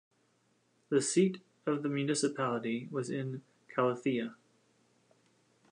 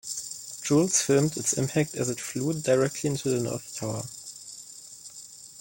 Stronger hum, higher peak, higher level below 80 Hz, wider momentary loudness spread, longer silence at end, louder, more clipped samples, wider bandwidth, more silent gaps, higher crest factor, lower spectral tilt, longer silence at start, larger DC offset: neither; second, -16 dBFS vs -8 dBFS; second, -84 dBFS vs -64 dBFS; second, 10 LU vs 20 LU; first, 1.4 s vs 0 s; second, -33 LUFS vs -26 LUFS; neither; second, 11.5 kHz vs 17 kHz; neither; about the same, 20 dB vs 20 dB; about the same, -5 dB/octave vs -4.5 dB/octave; first, 0.9 s vs 0.05 s; neither